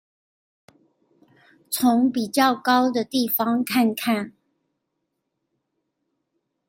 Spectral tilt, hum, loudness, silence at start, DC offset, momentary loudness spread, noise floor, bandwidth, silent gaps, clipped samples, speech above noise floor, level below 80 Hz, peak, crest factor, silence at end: -3.5 dB/octave; none; -21 LUFS; 1.7 s; under 0.1%; 6 LU; -78 dBFS; 16.5 kHz; none; under 0.1%; 57 dB; -72 dBFS; -4 dBFS; 20 dB; 2.4 s